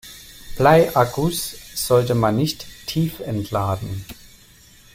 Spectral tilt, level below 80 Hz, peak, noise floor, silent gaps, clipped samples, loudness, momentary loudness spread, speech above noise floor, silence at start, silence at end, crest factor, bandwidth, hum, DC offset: -5.5 dB/octave; -44 dBFS; -2 dBFS; -49 dBFS; none; under 0.1%; -20 LUFS; 18 LU; 30 dB; 0.05 s; 0.8 s; 20 dB; 16.5 kHz; none; under 0.1%